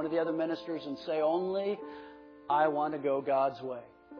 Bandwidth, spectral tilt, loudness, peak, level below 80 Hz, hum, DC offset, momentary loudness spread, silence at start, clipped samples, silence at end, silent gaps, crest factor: 5.4 kHz; -7.5 dB/octave; -32 LUFS; -14 dBFS; -76 dBFS; none; under 0.1%; 14 LU; 0 s; under 0.1%; 0 s; none; 18 dB